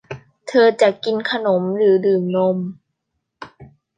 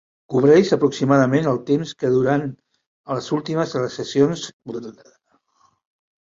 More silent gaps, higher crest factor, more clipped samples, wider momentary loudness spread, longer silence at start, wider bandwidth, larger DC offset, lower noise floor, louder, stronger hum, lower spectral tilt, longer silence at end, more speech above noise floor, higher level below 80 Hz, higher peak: second, none vs 2.87-3.04 s, 4.53-4.59 s; about the same, 18 dB vs 18 dB; neither; second, 13 LU vs 17 LU; second, 0.1 s vs 0.3 s; first, 9.4 kHz vs 7.6 kHz; neither; first, -76 dBFS vs -62 dBFS; about the same, -17 LUFS vs -19 LUFS; neither; about the same, -6.5 dB/octave vs -6.5 dB/octave; second, 0.35 s vs 1.3 s; first, 59 dB vs 43 dB; about the same, -64 dBFS vs -60 dBFS; about the same, -2 dBFS vs -2 dBFS